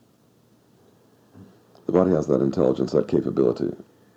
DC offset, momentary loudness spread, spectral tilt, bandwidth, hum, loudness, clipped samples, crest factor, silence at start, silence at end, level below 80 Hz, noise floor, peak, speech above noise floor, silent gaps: under 0.1%; 10 LU; -8.5 dB/octave; 8.2 kHz; none; -22 LUFS; under 0.1%; 20 dB; 1.35 s; 0.35 s; -56 dBFS; -59 dBFS; -4 dBFS; 38 dB; none